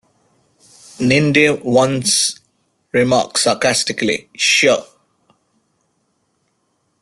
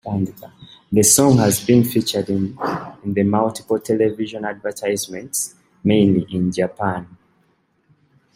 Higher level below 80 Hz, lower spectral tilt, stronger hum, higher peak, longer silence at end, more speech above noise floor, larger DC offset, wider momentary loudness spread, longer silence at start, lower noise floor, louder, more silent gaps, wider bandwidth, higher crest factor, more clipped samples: about the same, -56 dBFS vs -56 dBFS; second, -3 dB/octave vs -5 dB/octave; neither; about the same, -2 dBFS vs 0 dBFS; first, 2.2 s vs 1.3 s; first, 51 dB vs 44 dB; neither; second, 8 LU vs 13 LU; first, 1 s vs 0.05 s; first, -66 dBFS vs -62 dBFS; first, -15 LUFS vs -19 LUFS; neither; second, 12.5 kHz vs 16 kHz; about the same, 16 dB vs 20 dB; neither